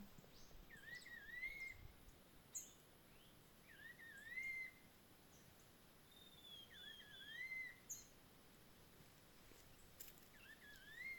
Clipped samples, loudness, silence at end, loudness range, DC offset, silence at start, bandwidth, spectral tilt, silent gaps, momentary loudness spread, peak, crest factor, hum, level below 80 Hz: under 0.1%; -55 LUFS; 0 s; 2 LU; under 0.1%; 0 s; 18 kHz; -1.5 dB/octave; none; 17 LU; -38 dBFS; 20 dB; none; -74 dBFS